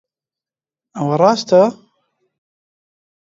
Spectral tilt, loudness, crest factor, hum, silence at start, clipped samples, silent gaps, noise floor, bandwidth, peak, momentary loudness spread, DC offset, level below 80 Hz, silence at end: -6 dB/octave; -15 LUFS; 18 dB; none; 0.95 s; under 0.1%; none; under -90 dBFS; 7.8 kHz; 0 dBFS; 11 LU; under 0.1%; -70 dBFS; 1.5 s